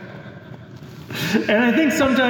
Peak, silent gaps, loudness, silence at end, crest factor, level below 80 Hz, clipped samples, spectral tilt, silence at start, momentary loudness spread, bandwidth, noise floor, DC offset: -6 dBFS; none; -18 LUFS; 0 s; 16 dB; -54 dBFS; under 0.1%; -4.5 dB/octave; 0 s; 22 LU; 19 kHz; -38 dBFS; under 0.1%